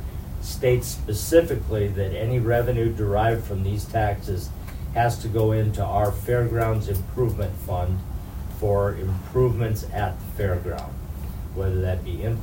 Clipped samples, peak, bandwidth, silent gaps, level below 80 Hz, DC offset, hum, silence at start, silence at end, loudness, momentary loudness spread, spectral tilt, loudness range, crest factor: under 0.1%; -4 dBFS; 16.5 kHz; none; -34 dBFS; under 0.1%; none; 0 s; 0 s; -25 LUFS; 11 LU; -7 dB/octave; 3 LU; 20 dB